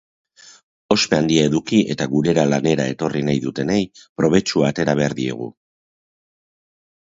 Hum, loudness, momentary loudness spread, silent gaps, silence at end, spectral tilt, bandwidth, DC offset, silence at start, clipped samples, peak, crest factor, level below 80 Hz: none; -19 LUFS; 6 LU; 4.09-4.15 s; 1.5 s; -5.5 dB/octave; 8 kHz; under 0.1%; 0.9 s; under 0.1%; 0 dBFS; 20 dB; -52 dBFS